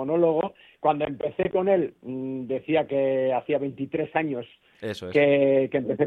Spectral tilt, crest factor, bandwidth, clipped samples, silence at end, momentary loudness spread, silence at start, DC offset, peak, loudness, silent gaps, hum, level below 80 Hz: -8 dB/octave; 18 dB; 8 kHz; under 0.1%; 0 s; 13 LU; 0 s; under 0.1%; -8 dBFS; -25 LUFS; none; none; -62 dBFS